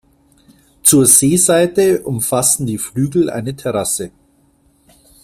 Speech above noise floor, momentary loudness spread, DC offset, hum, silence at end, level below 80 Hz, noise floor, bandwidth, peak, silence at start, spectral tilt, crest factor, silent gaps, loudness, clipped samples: 41 dB; 12 LU; under 0.1%; none; 1.15 s; -50 dBFS; -55 dBFS; 16 kHz; 0 dBFS; 0.85 s; -4 dB/octave; 16 dB; none; -13 LUFS; under 0.1%